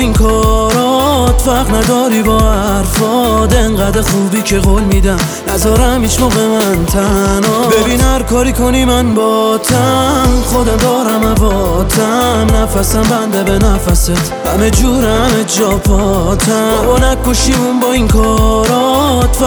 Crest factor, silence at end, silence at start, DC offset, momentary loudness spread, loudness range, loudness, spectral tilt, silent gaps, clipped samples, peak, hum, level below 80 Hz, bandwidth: 10 dB; 0 s; 0 s; under 0.1%; 2 LU; 1 LU; -11 LUFS; -5 dB/octave; none; under 0.1%; 0 dBFS; none; -16 dBFS; over 20 kHz